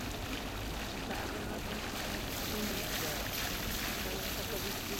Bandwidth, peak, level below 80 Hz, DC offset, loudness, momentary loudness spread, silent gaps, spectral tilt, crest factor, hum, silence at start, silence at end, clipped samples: 16.5 kHz; -20 dBFS; -46 dBFS; under 0.1%; -37 LUFS; 4 LU; none; -3 dB/octave; 18 dB; none; 0 s; 0 s; under 0.1%